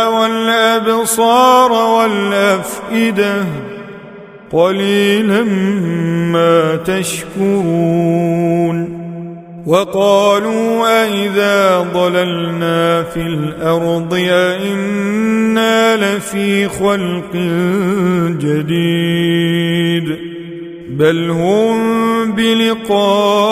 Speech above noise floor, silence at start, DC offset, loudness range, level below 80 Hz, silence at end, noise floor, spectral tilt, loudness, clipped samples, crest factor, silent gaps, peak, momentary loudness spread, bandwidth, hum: 21 dB; 0 s; under 0.1%; 3 LU; -48 dBFS; 0 s; -34 dBFS; -5.5 dB/octave; -13 LUFS; under 0.1%; 14 dB; none; 0 dBFS; 8 LU; 16 kHz; none